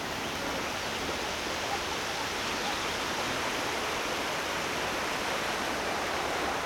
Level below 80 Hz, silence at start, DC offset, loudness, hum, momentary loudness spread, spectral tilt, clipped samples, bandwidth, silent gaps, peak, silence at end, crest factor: -54 dBFS; 0 s; under 0.1%; -31 LUFS; none; 2 LU; -2 dB/octave; under 0.1%; over 20 kHz; none; -18 dBFS; 0 s; 14 dB